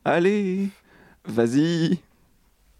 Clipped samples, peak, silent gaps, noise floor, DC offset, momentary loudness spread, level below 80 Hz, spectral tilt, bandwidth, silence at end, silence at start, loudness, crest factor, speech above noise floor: under 0.1%; -8 dBFS; none; -60 dBFS; under 0.1%; 10 LU; -64 dBFS; -6.5 dB/octave; 13 kHz; 0.8 s; 0.05 s; -23 LUFS; 16 dB; 39 dB